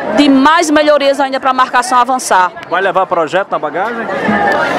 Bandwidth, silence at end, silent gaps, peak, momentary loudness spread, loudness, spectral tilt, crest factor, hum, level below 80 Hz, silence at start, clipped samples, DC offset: 15 kHz; 0 s; none; 0 dBFS; 8 LU; -11 LUFS; -3.5 dB/octave; 12 dB; none; -52 dBFS; 0 s; 0.1%; under 0.1%